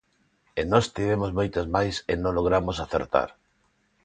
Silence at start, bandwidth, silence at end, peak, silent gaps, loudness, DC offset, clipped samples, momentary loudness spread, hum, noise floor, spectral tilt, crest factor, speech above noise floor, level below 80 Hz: 0.55 s; 9.4 kHz; 0.75 s; -4 dBFS; none; -26 LUFS; under 0.1%; under 0.1%; 6 LU; none; -68 dBFS; -6 dB/octave; 22 dB; 43 dB; -44 dBFS